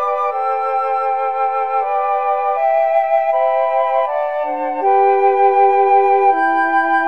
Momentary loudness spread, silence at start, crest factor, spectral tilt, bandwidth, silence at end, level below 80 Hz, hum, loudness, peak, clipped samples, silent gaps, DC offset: 6 LU; 0 s; 12 dB; -4.5 dB/octave; 5 kHz; 0 s; -72 dBFS; none; -15 LUFS; -2 dBFS; under 0.1%; none; 0.7%